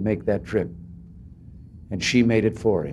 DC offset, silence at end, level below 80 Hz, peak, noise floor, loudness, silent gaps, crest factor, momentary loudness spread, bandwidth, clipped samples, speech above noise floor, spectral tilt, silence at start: under 0.1%; 0 s; -46 dBFS; -6 dBFS; -44 dBFS; -23 LUFS; none; 18 dB; 23 LU; 11.5 kHz; under 0.1%; 22 dB; -6 dB/octave; 0 s